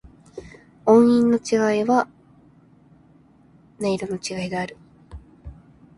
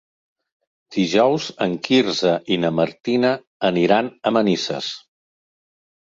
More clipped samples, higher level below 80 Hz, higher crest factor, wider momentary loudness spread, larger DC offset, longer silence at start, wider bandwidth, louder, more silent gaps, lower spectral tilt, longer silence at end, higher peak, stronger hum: neither; first, -52 dBFS vs -62 dBFS; about the same, 20 dB vs 18 dB; first, 26 LU vs 8 LU; neither; second, 0.35 s vs 0.9 s; first, 11.5 kHz vs 7.8 kHz; about the same, -20 LUFS vs -20 LUFS; second, none vs 3.00-3.04 s, 3.47-3.60 s; about the same, -5.5 dB/octave vs -5 dB/octave; second, 0.45 s vs 1.15 s; about the same, -2 dBFS vs -2 dBFS; neither